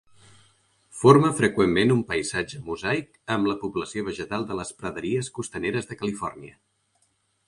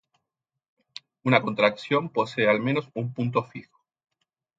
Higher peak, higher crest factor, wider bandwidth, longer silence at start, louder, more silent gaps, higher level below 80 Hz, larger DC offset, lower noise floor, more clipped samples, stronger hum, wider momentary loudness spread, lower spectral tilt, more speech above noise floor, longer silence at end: about the same, -2 dBFS vs -4 dBFS; about the same, 24 dB vs 22 dB; first, 11.5 kHz vs 7.8 kHz; second, 0.95 s vs 1.25 s; about the same, -24 LUFS vs -25 LUFS; neither; first, -54 dBFS vs -70 dBFS; neither; second, -69 dBFS vs -85 dBFS; neither; neither; second, 15 LU vs 22 LU; second, -5.5 dB/octave vs -7 dB/octave; second, 45 dB vs 61 dB; about the same, 1 s vs 0.95 s